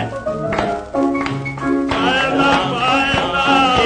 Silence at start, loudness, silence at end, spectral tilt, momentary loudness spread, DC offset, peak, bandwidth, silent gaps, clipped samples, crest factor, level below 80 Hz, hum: 0 s; -16 LUFS; 0 s; -5 dB/octave; 8 LU; under 0.1%; -2 dBFS; 9.6 kHz; none; under 0.1%; 16 dB; -40 dBFS; none